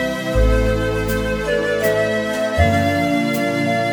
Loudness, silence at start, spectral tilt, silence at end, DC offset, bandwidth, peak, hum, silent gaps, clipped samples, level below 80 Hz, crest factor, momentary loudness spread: -18 LUFS; 0 s; -6 dB/octave; 0 s; under 0.1%; over 20 kHz; -2 dBFS; none; none; under 0.1%; -26 dBFS; 16 dB; 4 LU